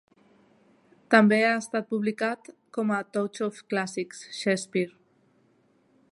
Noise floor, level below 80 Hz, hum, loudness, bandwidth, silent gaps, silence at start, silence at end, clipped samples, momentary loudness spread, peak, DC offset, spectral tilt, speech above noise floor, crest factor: -65 dBFS; -80 dBFS; none; -26 LUFS; 11.5 kHz; none; 1.1 s; 1.25 s; under 0.1%; 15 LU; -4 dBFS; under 0.1%; -5 dB/octave; 39 dB; 24 dB